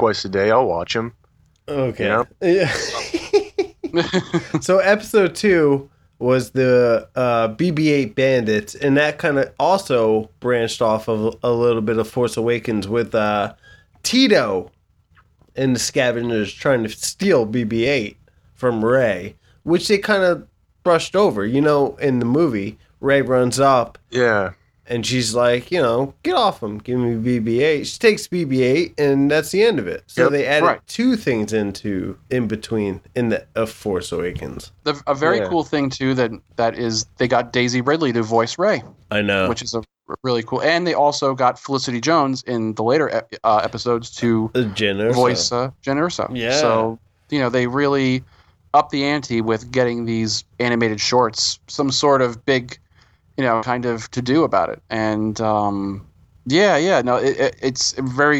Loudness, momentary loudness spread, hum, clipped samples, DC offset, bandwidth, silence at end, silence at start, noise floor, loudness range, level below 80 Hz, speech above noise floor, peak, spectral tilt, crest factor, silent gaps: -19 LUFS; 8 LU; none; under 0.1%; under 0.1%; 16 kHz; 0 s; 0 s; -56 dBFS; 3 LU; -52 dBFS; 38 dB; -2 dBFS; -5 dB/octave; 16 dB; none